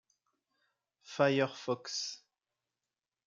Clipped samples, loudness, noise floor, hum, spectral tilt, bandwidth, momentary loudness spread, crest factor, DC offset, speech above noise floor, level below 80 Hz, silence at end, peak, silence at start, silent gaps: under 0.1%; -33 LUFS; under -90 dBFS; none; -4 dB/octave; 7.6 kHz; 16 LU; 24 dB; under 0.1%; over 57 dB; -84 dBFS; 1.1 s; -14 dBFS; 1.1 s; none